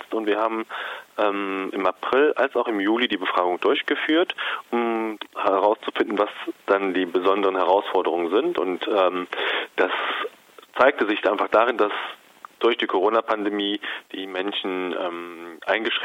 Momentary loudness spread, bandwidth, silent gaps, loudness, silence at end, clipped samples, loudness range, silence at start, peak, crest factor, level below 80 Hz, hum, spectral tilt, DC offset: 10 LU; 16 kHz; none; -23 LUFS; 0 s; under 0.1%; 2 LU; 0 s; -2 dBFS; 20 dB; -70 dBFS; none; -5 dB/octave; under 0.1%